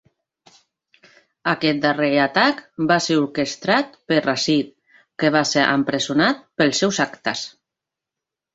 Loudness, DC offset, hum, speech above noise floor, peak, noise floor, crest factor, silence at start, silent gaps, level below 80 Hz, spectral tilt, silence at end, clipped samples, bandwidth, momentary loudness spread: -19 LUFS; under 0.1%; none; 67 dB; 0 dBFS; -86 dBFS; 20 dB; 1.45 s; none; -62 dBFS; -4 dB/octave; 1.05 s; under 0.1%; 8 kHz; 8 LU